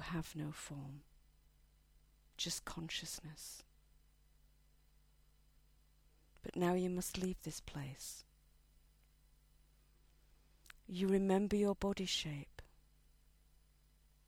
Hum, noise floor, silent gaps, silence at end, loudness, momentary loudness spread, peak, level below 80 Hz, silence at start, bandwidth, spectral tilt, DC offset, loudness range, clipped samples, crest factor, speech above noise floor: none; -70 dBFS; none; 1.65 s; -40 LUFS; 19 LU; -20 dBFS; -62 dBFS; 0 s; 17 kHz; -4.5 dB/octave; under 0.1%; 15 LU; under 0.1%; 24 dB; 30 dB